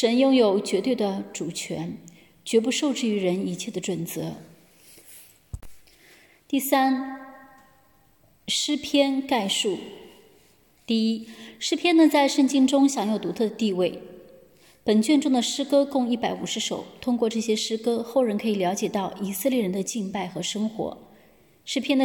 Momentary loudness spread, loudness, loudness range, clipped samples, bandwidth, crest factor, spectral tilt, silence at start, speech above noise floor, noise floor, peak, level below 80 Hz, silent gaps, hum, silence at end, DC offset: 14 LU; -24 LUFS; 7 LU; under 0.1%; 17.5 kHz; 18 dB; -4 dB/octave; 0 s; 37 dB; -61 dBFS; -8 dBFS; -60 dBFS; none; none; 0 s; under 0.1%